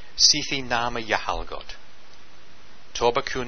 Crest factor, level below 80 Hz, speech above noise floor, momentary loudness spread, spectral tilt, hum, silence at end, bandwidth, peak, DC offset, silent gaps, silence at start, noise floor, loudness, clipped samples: 24 dB; -44 dBFS; 27 dB; 20 LU; -1 dB/octave; none; 0 s; 6.6 kHz; -4 dBFS; 2%; none; 0.15 s; -51 dBFS; -22 LUFS; under 0.1%